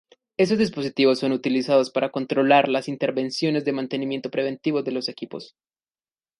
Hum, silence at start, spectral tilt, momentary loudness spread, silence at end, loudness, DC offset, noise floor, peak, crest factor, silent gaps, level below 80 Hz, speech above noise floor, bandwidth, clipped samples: none; 0.4 s; -5.5 dB/octave; 10 LU; 0.95 s; -23 LUFS; under 0.1%; under -90 dBFS; -4 dBFS; 20 dB; none; -66 dBFS; over 68 dB; 11.5 kHz; under 0.1%